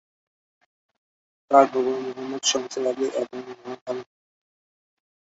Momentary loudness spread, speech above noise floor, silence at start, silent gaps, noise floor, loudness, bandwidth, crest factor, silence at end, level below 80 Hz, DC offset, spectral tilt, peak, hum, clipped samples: 17 LU; over 67 dB; 1.5 s; 3.81-3.86 s; under -90 dBFS; -23 LUFS; 8 kHz; 24 dB; 1.2 s; -76 dBFS; under 0.1%; -2 dB/octave; -2 dBFS; none; under 0.1%